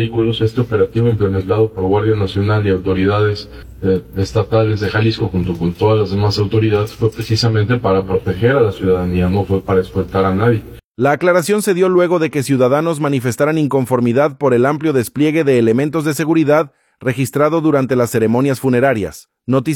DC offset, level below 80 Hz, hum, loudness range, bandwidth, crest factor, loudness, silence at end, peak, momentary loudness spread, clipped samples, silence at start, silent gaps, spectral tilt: under 0.1%; -42 dBFS; none; 2 LU; 17 kHz; 14 dB; -15 LUFS; 0 s; -2 dBFS; 5 LU; under 0.1%; 0 s; 10.84-10.95 s; -7 dB/octave